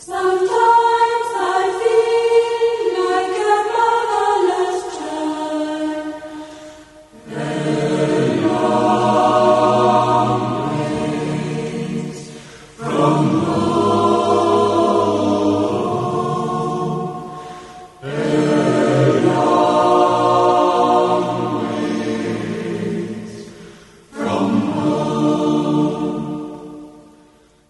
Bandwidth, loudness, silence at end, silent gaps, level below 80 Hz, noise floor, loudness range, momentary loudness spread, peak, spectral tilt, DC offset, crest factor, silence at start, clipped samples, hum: 11.5 kHz; -17 LUFS; 0.7 s; none; -54 dBFS; -51 dBFS; 7 LU; 16 LU; -2 dBFS; -6 dB/octave; under 0.1%; 14 dB; 0 s; under 0.1%; none